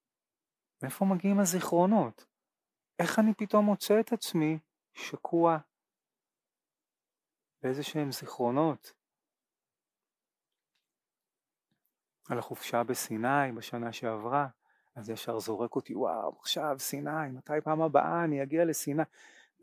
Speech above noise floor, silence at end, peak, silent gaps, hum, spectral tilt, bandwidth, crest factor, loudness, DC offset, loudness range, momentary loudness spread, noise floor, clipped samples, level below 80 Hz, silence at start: over 60 dB; 0.6 s; -10 dBFS; none; none; -5 dB/octave; 16 kHz; 22 dB; -31 LUFS; under 0.1%; 8 LU; 11 LU; under -90 dBFS; under 0.1%; -84 dBFS; 0.8 s